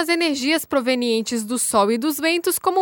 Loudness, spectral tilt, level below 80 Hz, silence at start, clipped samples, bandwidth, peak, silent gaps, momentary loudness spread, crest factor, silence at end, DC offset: -20 LUFS; -2.5 dB/octave; -62 dBFS; 0 s; under 0.1%; over 20 kHz; -4 dBFS; none; 3 LU; 16 dB; 0 s; under 0.1%